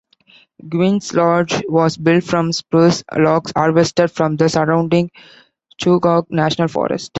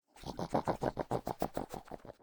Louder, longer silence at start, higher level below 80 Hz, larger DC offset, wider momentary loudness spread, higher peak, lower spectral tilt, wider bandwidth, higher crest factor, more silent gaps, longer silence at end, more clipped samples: first, -16 LUFS vs -39 LUFS; first, 0.65 s vs 0.15 s; about the same, -52 dBFS vs -56 dBFS; neither; second, 4 LU vs 12 LU; first, -2 dBFS vs -16 dBFS; about the same, -6 dB/octave vs -6.5 dB/octave; second, 8.2 kHz vs over 20 kHz; second, 14 dB vs 22 dB; neither; about the same, 0 s vs 0.1 s; neither